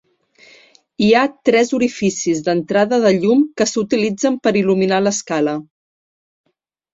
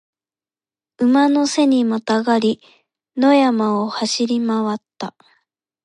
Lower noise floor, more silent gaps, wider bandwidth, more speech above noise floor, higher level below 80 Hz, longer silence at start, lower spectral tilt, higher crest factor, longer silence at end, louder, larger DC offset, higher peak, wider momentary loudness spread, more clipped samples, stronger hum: second, -50 dBFS vs under -90 dBFS; neither; second, 8 kHz vs 11 kHz; second, 34 dB vs over 73 dB; first, -58 dBFS vs -72 dBFS; about the same, 1 s vs 1 s; about the same, -4.5 dB/octave vs -4.5 dB/octave; about the same, 16 dB vs 16 dB; first, 1.3 s vs 0.75 s; about the same, -16 LUFS vs -17 LUFS; neither; about the same, -2 dBFS vs -2 dBFS; second, 5 LU vs 15 LU; neither; neither